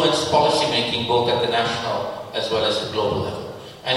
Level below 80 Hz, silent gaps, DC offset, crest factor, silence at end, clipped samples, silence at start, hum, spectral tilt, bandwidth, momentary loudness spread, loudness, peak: -52 dBFS; none; under 0.1%; 16 dB; 0 s; under 0.1%; 0 s; none; -4 dB/octave; 16 kHz; 10 LU; -21 LUFS; -6 dBFS